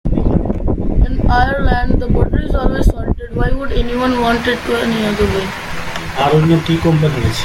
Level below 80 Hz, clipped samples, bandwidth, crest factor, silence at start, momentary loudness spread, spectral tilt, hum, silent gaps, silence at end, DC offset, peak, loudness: -18 dBFS; under 0.1%; 16 kHz; 14 dB; 0.05 s; 7 LU; -6.5 dB/octave; none; none; 0 s; under 0.1%; 0 dBFS; -16 LUFS